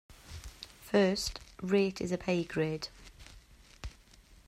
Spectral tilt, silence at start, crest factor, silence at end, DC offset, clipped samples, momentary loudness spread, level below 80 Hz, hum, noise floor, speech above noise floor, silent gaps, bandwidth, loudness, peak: -5 dB/octave; 0.1 s; 20 dB; 0.6 s; under 0.1%; under 0.1%; 20 LU; -54 dBFS; none; -59 dBFS; 28 dB; none; 15 kHz; -32 LUFS; -16 dBFS